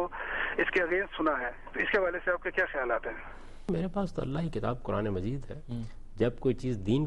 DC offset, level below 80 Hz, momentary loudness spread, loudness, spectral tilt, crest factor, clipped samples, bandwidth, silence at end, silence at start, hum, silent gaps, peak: under 0.1%; -46 dBFS; 12 LU; -32 LUFS; -7.5 dB/octave; 16 dB; under 0.1%; 11 kHz; 0 s; 0 s; none; none; -14 dBFS